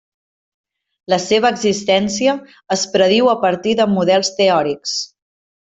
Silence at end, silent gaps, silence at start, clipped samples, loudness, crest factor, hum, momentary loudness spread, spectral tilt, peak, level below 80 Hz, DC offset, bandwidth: 0.7 s; none; 1.1 s; under 0.1%; -16 LUFS; 16 dB; none; 8 LU; -4 dB/octave; -2 dBFS; -58 dBFS; under 0.1%; 8.4 kHz